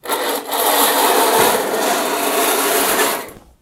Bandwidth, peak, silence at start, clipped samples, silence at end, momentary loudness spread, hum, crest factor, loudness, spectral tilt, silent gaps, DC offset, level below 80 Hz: 17.5 kHz; 0 dBFS; 0.05 s; under 0.1%; 0.25 s; 7 LU; none; 16 dB; -15 LUFS; -1 dB/octave; none; under 0.1%; -56 dBFS